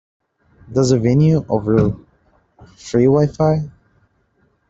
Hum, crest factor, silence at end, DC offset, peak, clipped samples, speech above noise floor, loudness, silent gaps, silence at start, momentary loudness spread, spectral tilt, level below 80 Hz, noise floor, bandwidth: none; 16 dB; 1 s; under 0.1%; -2 dBFS; under 0.1%; 46 dB; -16 LUFS; none; 0.7 s; 12 LU; -8 dB/octave; -44 dBFS; -61 dBFS; 7.8 kHz